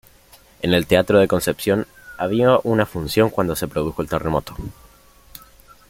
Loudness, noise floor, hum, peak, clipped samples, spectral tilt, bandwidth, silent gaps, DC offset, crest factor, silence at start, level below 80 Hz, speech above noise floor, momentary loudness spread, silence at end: -19 LUFS; -50 dBFS; none; -2 dBFS; under 0.1%; -5.5 dB/octave; 17 kHz; none; under 0.1%; 18 dB; 0.6 s; -44 dBFS; 31 dB; 11 LU; 1.2 s